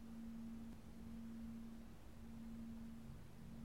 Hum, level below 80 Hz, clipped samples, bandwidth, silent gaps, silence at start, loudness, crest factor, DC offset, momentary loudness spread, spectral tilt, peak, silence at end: none; -62 dBFS; under 0.1%; 16 kHz; none; 0 s; -55 LUFS; 12 dB; 0.1%; 5 LU; -7 dB/octave; -42 dBFS; 0 s